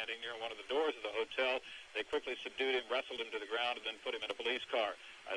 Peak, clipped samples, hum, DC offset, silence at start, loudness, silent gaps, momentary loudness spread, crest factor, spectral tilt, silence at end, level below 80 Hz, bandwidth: -24 dBFS; under 0.1%; none; under 0.1%; 0 s; -38 LUFS; none; 7 LU; 16 dB; -1.5 dB/octave; 0 s; -74 dBFS; 11 kHz